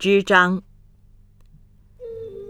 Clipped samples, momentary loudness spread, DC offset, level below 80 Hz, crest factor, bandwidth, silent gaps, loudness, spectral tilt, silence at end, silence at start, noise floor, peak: under 0.1%; 23 LU; under 0.1%; -52 dBFS; 22 dB; 13 kHz; none; -17 LUFS; -5 dB/octave; 0.05 s; 0 s; -51 dBFS; -2 dBFS